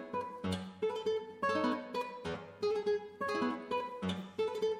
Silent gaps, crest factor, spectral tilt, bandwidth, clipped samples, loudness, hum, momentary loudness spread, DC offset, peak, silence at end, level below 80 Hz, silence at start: none; 16 dB; -5.5 dB/octave; 14 kHz; under 0.1%; -37 LUFS; none; 6 LU; under 0.1%; -22 dBFS; 0 s; -70 dBFS; 0 s